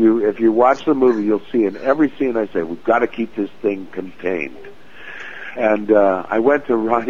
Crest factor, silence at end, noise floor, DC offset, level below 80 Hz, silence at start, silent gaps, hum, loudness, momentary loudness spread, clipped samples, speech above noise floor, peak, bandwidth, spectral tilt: 16 dB; 0 s; -37 dBFS; 2%; -54 dBFS; 0 s; none; none; -18 LUFS; 15 LU; under 0.1%; 20 dB; -2 dBFS; 7 kHz; -7.5 dB/octave